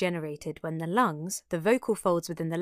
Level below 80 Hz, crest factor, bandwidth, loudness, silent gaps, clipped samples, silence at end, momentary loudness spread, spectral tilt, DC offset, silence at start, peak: -64 dBFS; 18 dB; 15 kHz; -29 LUFS; none; under 0.1%; 0 s; 9 LU; -5.5 dB/octave; under 0.1%; 0 s; -12 dBFS